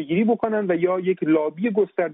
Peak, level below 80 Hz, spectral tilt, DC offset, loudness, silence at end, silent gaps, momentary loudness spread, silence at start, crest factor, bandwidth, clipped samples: -8 dBFS; -68 dBFS; -6.5 dB/octave; under 0.1%; -22 LUFS; 0 s; none; 2 LU; 0 s; 12 dB; 3.9 kHz; under 0.1%